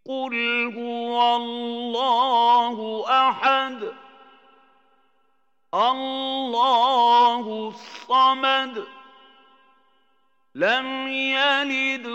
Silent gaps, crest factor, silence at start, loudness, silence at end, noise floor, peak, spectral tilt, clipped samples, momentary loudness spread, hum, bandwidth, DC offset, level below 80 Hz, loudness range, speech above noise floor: none; 16 dB; 0.05 s; -21 LUFS; 0 s; -71 dBFS; -8 dBFS; -3 dB/octave; under 0.1%; 12 LU; none; 8 kHz; under 0.1%; under -90 dBFS; 5 LU; 49 dB